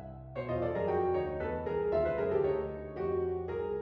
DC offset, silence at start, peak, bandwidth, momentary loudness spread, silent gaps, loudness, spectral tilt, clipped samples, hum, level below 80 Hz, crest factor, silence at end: under 0.1%; 0 s; -20 dBFS; 5.2 kHz; 7 LU; none; -33 LUFS; -10 dB/octave; under 0.1%; none; -52 dBFS; 14 dB; 0 s